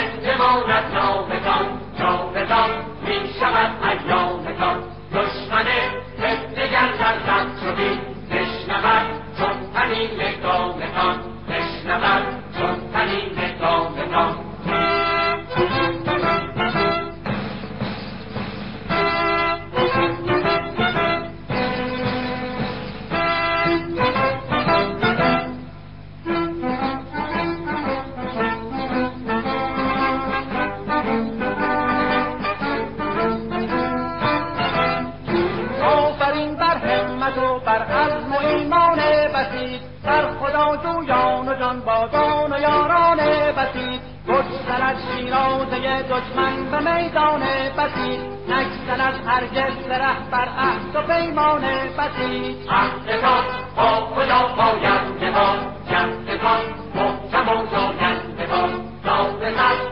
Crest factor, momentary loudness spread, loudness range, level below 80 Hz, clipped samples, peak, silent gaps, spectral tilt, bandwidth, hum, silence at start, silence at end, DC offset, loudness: 16 dB; 8 LU; 4 LU; -42 dBFS; under 0.1%; -4 dBFS; none; -7.5 dB/octave; 6.4 kHz; 50 Hz at -40 dBFS; 0 s; 0 s; 0.7%; -21 LUFS